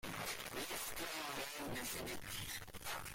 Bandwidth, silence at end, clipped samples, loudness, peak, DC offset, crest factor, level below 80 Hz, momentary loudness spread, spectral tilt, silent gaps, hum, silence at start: 16.5 kHz; 0 s; under 0.1%; -44 LUFS; -32 dBFS; under 0.1%; 14 dB; -62 dBFS; 3 LU; -2 dB/octave; none; none; 0.05 s